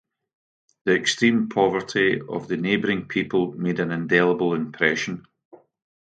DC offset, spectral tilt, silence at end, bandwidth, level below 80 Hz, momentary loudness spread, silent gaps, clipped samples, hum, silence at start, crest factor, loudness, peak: under 0.1%; -5 dB/octave; 0.85 s; 9.2 kHz; -62 dBFS; 8 LU; none; under 0.1%; none; 0.85 s; 20 dB; -22 LUFS; -2 dBFS